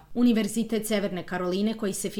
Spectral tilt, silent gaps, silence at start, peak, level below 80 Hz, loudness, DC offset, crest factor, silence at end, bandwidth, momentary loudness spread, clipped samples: -5 dB/octave; none; 0.1 s; -12 dBFS; -54 dBFS; -27 LUFS; under 0.1%; 14 dB; 0 s; 17.5 kHz; 7 LU; under 0.1%